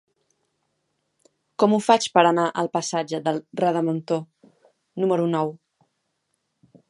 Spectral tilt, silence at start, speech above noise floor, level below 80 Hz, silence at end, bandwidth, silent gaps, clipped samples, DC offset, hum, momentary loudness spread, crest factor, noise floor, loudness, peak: -5 dB/octave; 1.6 s; 54 dB; -76 dBFS; 1.35 s; 11.5 kHz; none; under 0.1%; under 0.1%; none; 10 LU; 22 dB; -75 dBFS; -22 LUFS; -2 dBFS